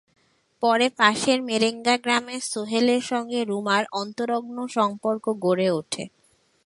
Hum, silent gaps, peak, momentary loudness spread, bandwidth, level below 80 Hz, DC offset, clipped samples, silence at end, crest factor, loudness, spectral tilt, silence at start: none; none; -2 dBFS; 9 LU; 11.5 kHz; -70 dBFS; under 0.1%; under 0.1%; 0.6 s; 22 dB; -23 LUFS; -3.5 dB/octave; 0.6 s